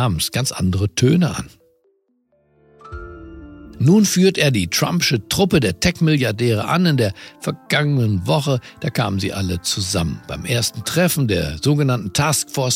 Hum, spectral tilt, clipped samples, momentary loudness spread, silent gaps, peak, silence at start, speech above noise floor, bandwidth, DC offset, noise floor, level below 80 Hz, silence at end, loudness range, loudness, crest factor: none; -5 dB/octave; under 0.1%; 13 LU; none; -2 dBFS; 0 s; 45 dB; 16.5 kHz; under 0.1%; -63 dBFS; -42 dBFS; 0 s; 5 LU; -18 LUFS; 16 dB